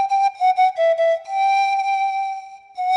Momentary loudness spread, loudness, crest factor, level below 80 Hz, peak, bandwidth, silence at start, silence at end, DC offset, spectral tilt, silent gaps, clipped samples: 10 LU; -19 LUFS; 10 dB; -78 dBFS; -10 dBFS; 9.6 kHz; 0 s; 0 s; under 0.1%; 1.5 dB/octave; none; under 0.1%